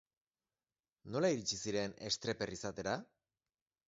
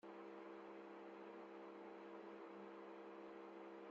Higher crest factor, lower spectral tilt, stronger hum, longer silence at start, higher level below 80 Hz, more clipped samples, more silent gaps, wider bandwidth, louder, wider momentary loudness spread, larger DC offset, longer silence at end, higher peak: first, 20 dB vs 12 dB; about the same, -3.5 dB/octave vs -4 dB/octave; neither; first, 1.05 s vs 0.05 s; first, -70 dBFS vs under -90 dBFS; neither; neither; about the same, 7.6 kHz vs 7.4 kHz; first, -39 LUFS vs -57 LUFS; first, 7 LU vs 1 LU; neither; first, 0.85 s vs 0 s; first, -22 dBFS vs -46 dBFS